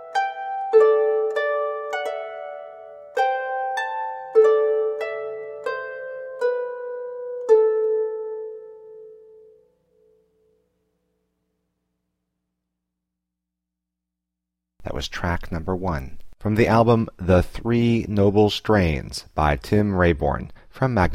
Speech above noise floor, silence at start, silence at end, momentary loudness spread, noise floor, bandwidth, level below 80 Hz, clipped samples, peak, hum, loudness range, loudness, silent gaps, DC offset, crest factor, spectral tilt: 64 dB; 0 s; 0 s; 16 LU; -84 dBFS; 13.5 kHz; -40 dBFS; under 0.1%; -6 dBFS; none; 11 LU; -22 LUFS; none; under 0.1%; 18 dB; -7 dB/octave